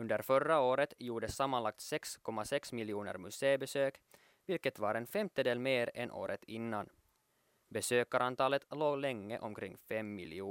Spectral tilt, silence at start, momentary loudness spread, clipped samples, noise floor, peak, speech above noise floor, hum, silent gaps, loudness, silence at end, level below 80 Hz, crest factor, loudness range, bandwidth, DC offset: -4.5 dB/octave; 0 s; 11 LU; under 0.1%; -76 dBFS; -18 dBFS; 40 dB; none; none; -37 LUFS; 0 s; -72 dBFS; 20 dB; 2 LU; 16.5 kHz; under 0.1%